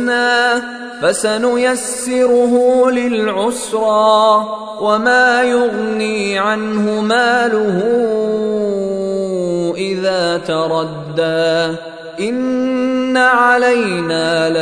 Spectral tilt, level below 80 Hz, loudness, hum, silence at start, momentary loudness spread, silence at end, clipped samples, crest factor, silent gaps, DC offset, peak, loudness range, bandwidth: -4 dB/octave; -54 dBFS; -14 LUFS; none; 0 s; 8 LU; 0 s; under 0.1%; 14 dB; none; under 0.1%; 0 dBFS; 4 LU; 11 kHz